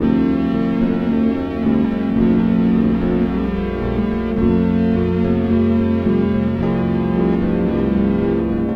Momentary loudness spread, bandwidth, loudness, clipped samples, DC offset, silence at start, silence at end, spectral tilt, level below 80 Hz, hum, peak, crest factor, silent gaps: 4 LU; 5.2 kHz; -17 LUFS; under 0.1%; under 0.1%; 0 s; 0 s; -10 dB/octave; -32 dBFS; none; -4 dBFS; 12 dB; none